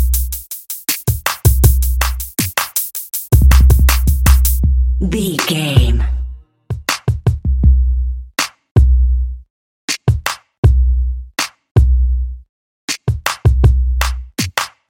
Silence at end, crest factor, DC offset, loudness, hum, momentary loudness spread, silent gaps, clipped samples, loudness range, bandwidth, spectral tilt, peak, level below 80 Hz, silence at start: 0.2 s; 14 dB; under 0.1%; -15 LUFS; none; 11 LU; 8.71-8.75 s, 9.50-9.88 s, 10.58-10.63 s, 11.71-11.75 s, 12.49-12.88 s; under 0.1%; 4 LU; 17 kHz; -4.5 dB/octave; 0 dBFS; -16 dBFS; 0 s